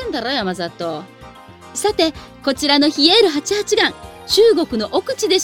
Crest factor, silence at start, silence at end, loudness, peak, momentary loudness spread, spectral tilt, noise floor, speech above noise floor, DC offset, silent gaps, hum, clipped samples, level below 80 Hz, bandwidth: 18 dB; 0 s; 0 s; -16 LUFS; 0 dBFS; 14 LU; -2.5 dB/octave; -39 dBFS; 23 dB; under 0.1%; none; none; under 0.1%; -48 dBFS; 17.5 kHz